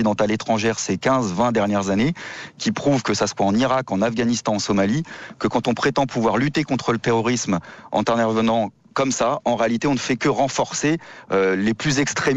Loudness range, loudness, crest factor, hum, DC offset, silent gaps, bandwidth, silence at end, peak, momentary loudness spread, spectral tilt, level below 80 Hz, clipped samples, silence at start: 1 LU; -21 LUFS; 12 dB; none; under 0.1%; none; 8.4 kHz; 0 s; -8 dBFS; 5 LU; -5 dB/octave; -52 dBFS; under 0.1%; 0 s